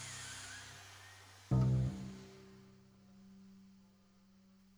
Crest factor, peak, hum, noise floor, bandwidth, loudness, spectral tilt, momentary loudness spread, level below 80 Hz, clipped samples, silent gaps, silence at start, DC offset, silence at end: 20 dB; -22 dBFS; none; -67 dBFS; 12 kHz; -39 LUFS; -6 dB/octave; 27 LU; -56 dBFS; under 0.1%; none; 0 s; under 0.1%; 1.05 s